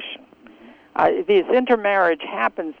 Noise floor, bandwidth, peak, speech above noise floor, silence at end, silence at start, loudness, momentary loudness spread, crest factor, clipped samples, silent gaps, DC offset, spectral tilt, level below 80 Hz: -47 dBFS; 6 kHz; -4 dBFS; 28 dB; 0.1 s; 0 s; -19 LUFS; 13 LU; 18 dB; under 0.1%; none; under 0.1%; -6.5 dB/octave; -60 dBFS